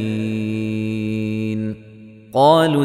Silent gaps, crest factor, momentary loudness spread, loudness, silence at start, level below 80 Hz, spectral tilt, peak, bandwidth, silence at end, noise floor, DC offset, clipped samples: none; 16 dB; 12 LU; -19 LUFS; 0 s; -56 dBFS; -7 dB/octave; -2 dBFS; 14.5 kHz; 0 s; -41 dBFS; under 0.1%; under 0.1%